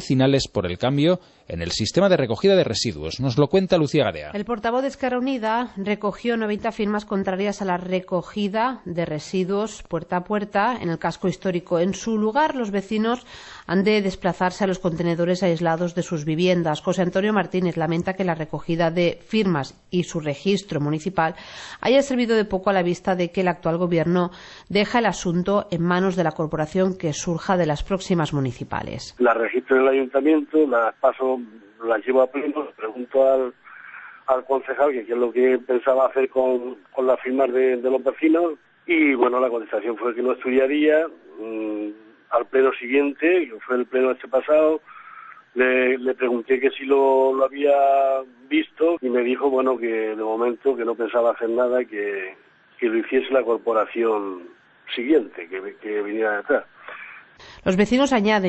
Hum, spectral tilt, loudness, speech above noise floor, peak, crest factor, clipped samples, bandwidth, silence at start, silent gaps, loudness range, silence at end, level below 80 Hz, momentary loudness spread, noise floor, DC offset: none; -6 dB/octave; -22 LUFS; 22 dB; -6 dBFS; 16 dB; under 0.1%; 8.4 kHz; 0 s; none; 4 LU; 0 s; -52 dBFS; 10 LU; -43 dBFS; under 0.1%